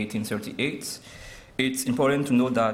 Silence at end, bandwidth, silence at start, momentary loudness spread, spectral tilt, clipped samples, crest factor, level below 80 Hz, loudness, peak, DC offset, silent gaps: 0 s; 16 kHz; 0 s; 16 LU; -4.5 dB/octave; under 0.1%; 18 dB; -56 dBFS; -26 LUFS; -8 dBFS; under 0.1%; none